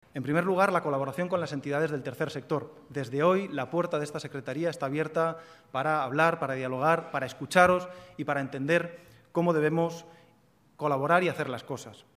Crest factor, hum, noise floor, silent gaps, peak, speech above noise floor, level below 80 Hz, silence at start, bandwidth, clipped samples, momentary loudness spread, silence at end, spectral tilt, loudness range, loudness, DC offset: 24 dB; none; -63 dBFS; none; -6 dBFS; 35 dB; -68 dBFS; 0.15 s; 15.5 kHz; under 0.1%; 12 LU; 0.15 s; -6 dB/octave; 3 LU; -28 LUFS; under 0.1%